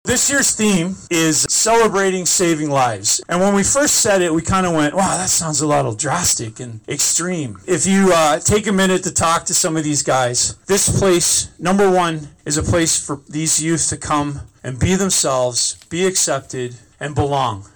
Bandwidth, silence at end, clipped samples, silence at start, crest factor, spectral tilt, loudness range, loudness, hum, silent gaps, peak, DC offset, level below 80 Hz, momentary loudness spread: over 20 kHz; 0.1 s; under 0.1%; 0.05 s; 10 dB; -3 dB/octave; 3 LU; -16 LUFS; none; none; -8 dBFS; under 0.1%; -40 dBFS; 8 LU